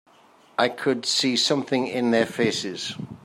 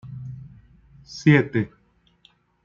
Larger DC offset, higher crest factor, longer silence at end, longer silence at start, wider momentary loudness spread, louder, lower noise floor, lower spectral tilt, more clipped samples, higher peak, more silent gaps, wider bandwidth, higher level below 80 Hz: neither; about the same, 20 dB vs 22 dB; second, 0.1 s vs 1 s; first, 0.6 s vs 0.05 s; second, 10 LU vs 22 LU; about the same, -23 LUFS vs -21 LUFS; second, -55 dBFS vs -60 dBFS; second, -3.5 dB/octave vs -7.5 dB/octave; neither; about the same, -6 dBFS vs -4 dBFS; neither; first, 15 kHz vs 7.2 kHz; second, -68 dBFS vs -58 dBFS